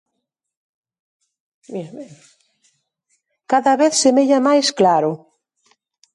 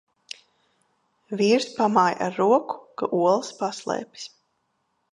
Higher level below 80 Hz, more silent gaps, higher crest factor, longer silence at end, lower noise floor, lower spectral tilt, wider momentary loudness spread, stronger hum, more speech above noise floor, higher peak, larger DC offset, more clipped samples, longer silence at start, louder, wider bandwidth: about the same, -74 dBFS vs -74 dBFS; neither; about the same, 16 dB vs 20 dB; first, 1 s vs 0.85 s; first, -78 dBFS vs -73 dBFS; second, -3.5 dB/octave vs -5 dB/octave; about the same, 19 LU vs 20 LU; neither; first, 62 dB vs 50 dB; about the same, -4 dBFS vs -4 dBFS; neither; neither; first, 1.7 s vs 1.3 s; first, -15 LUFS vs -23 LUFS; about the same, 11.5 kHz vs 11.5 kHz